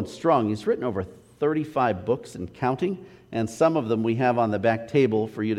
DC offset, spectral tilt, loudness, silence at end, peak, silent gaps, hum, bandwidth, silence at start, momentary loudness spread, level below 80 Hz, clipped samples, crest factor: under 0.1%; -7 dB/octave; -25 LUFS; 0 s; -8 dBFS; none; none; 13 kHz; 0 s; 8 LU; -60 dBFS; under 0.1%; 16 dB